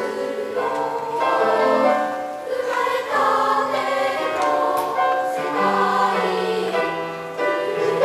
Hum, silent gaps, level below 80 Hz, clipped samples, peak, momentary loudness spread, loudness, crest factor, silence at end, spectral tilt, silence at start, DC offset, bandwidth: none; none; -66 dBFS; under 0.1%; -4 dBFS; 7 LU; -21 LUFS; 16 dB; 0 s; -4 dB/octave; 0 s; under 0.1%; 15.5 kHz